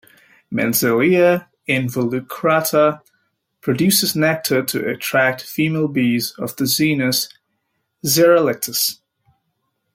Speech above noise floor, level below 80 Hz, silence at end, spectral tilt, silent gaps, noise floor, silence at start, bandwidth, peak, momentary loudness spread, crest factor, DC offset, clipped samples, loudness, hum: 54 dB; -62 dBFS; 1 s; -4 dB/octave; none; -72 dBFS; 0.5 s; 16.5 kHz; 0 dBFS; 9 LU; 18 dB; under 0.1%; under 0.1%; -17 LUFS; none